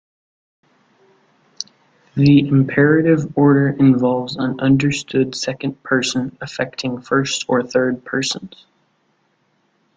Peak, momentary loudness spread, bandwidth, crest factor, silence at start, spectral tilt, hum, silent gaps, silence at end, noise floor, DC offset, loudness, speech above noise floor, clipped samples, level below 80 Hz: -2 dBFS; 13 LU; 9.4 kHz; 16 dB; 1.6 s; -6 dB/octave; none; none; 1.5 s; -63 dBFS; under 0.1%; -17 LUFS; 47 dB; under 0.1%; -54 dBFS